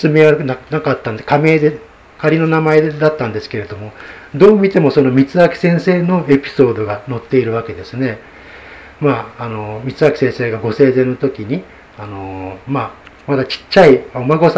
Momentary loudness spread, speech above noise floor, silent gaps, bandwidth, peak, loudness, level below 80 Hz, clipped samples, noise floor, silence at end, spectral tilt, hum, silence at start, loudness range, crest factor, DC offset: 17 LU; 22 dB; none; 8 kHz; 0 dBFS; -14 LUFS; -46 dBFS; 0.3%; -36 dBFS; 0 s; -8 dB/octave; none; 0 s; 6 LU; 14 dB; under 0.1%